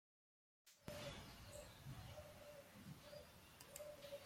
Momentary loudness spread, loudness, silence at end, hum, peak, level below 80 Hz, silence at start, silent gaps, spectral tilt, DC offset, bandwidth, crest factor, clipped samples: 7 LU; -58 LUFS; 0 s; none; -36 dBFS; -72 dBFS; 0.65 s; none; -4 dB/octave; under 0.1%; 16.5 kHz; 22 dB; under 0.1%